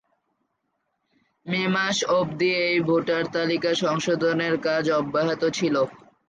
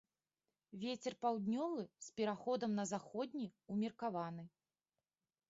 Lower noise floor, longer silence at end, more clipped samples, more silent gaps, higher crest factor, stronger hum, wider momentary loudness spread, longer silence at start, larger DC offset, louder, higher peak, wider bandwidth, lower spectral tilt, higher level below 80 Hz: second, -76 dBFS vs under -90 dBFS; second, 0.35 s vs 1 s; neither; neither; about the same, 14 dB vs 18 dB; neither; second, 3 LU vs 9 LU; first, 1.45 s vs 0.7 s; neither; first, -23 LUFS vs -43 LUFS; first, -10 dBFS vs -26 dBFS; first, 9.4 kHz vs 7.6 kHz; about the same, -4.5 dB/octave vs -5.5 dB/octave; first, -66 dBFS vs -86 dBFS